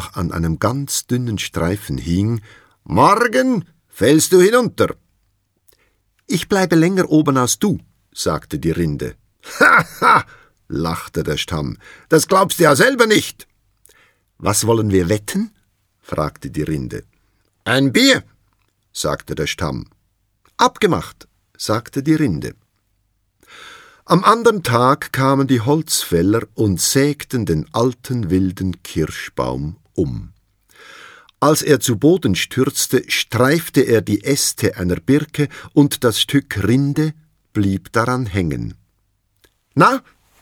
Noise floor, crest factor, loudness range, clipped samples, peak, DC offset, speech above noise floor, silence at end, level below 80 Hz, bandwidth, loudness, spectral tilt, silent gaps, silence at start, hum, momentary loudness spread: -65 dBFS; 18 dB; 5 LU; under 0.1%; 0 dBFS; under 0.1%; 49 dB; 0.4 s; -42 dBFS; 19.5 kHz; -17 LUFS; -4.5 dB/octave; none; 0 s; none; 12 LU